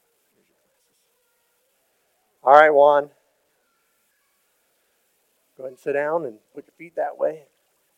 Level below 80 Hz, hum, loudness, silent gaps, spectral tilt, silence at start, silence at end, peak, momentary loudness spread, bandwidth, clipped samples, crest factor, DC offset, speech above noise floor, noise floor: -82 dBFS; none; -18 LUFS; none; -5 dB/octave; 2.45 s; 0.6 s; 0 dBFS; 26 LU; 8.6 kHz; under 0.1%; 24 dB; under 0.1%; 49 dB; -68 dBFS